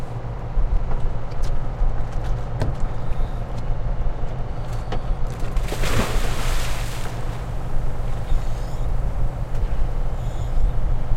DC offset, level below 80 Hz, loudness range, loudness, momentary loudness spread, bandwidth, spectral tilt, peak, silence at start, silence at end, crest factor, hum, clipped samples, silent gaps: under 0.1%; -22 dBFS; 2 LU; -28 LUFS; 4 LU; 13.5 kHz; -5.5 dB/octave; -6 dBFS; 0 s; 0 s; 14 dB; none; under 0.1%; none